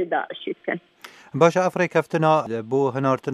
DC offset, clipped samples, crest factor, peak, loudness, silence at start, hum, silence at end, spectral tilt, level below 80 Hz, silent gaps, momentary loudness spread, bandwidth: under 0.1%; under 0.1%; 20 dB; -2 dBFS; -22 LUFS; 0 s; none; 0 s; -6.5 dB/octave; -72 dBFS; none; 12 LU; 13.5 kHz